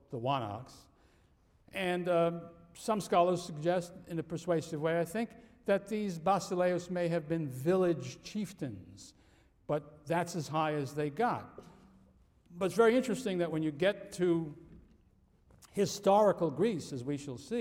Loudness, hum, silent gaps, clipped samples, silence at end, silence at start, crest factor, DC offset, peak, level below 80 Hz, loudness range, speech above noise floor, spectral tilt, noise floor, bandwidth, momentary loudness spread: -33 LUFS; none; none; under 0.1%; 0 s; 0.1 s; 18 dB; under 0.1%; -14 dBFS; -68 dBFS; 4 LU; 34 dB; -6 dB/octave; -67 dBFS; 16.5 kHz; 14 LU